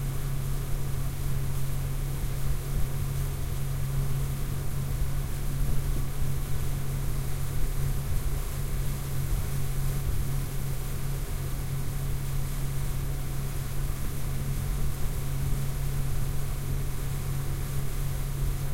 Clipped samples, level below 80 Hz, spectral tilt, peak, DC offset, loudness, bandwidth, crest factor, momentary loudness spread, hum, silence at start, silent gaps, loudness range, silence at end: under 0.1%; -32 dBFS; -5.5 dB/octave; -14 dBFS; under 0.1%; -33 LUFS; 16 kHz; 14 dB; 2 LU; none; 0 s; none; 1 LU; 0 s